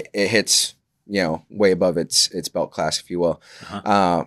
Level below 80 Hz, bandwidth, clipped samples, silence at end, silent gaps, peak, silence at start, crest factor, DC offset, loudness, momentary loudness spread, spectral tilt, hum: -60 dBFS; 14 kHz; under 0.1%; 0 s; none; 0 dBFS; 0 s; 20 dB; under 0.1%; -20 LUFS; 9 LU; -3 dB/octave; none